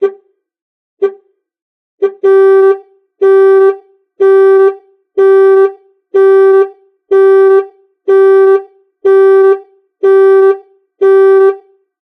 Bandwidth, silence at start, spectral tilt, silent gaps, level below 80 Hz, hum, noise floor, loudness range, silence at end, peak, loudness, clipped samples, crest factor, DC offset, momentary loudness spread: 3.7 kHz; 0 s; -5 dB/octave; 0.62-0.97 s, 1.62-1.98 s; -76 dBFS; none; -41 dBFS; 2 LU; 0.5 s; 0 dBFS; -8 LUFS; under 0.1%; 8 dB; under 0.1%; 11 LU